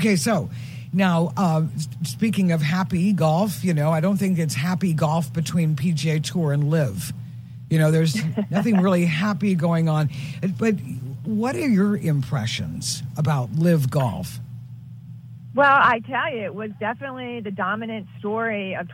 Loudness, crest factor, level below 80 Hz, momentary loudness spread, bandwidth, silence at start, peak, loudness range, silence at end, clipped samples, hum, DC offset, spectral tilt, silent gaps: -22 LUFS; 18 dB; -56 dBFS; 12 LU; 16.5 kHz; 0 s; -4 dBFS; 2 LU; 0 s; under 0.1%; none; under 0.1%; -6 dB/octave; none